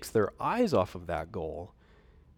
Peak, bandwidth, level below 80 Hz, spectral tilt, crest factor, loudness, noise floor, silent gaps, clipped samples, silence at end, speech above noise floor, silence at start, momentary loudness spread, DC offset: -14 dBFS; 18 kHz; -54 dBFS; -6 dB/octave; 18 dB; -31 LUFS; -59 dBFS; none; under 0.1%; 0.7 s; 28 dB; 0 s; 14 LU; under 0.1%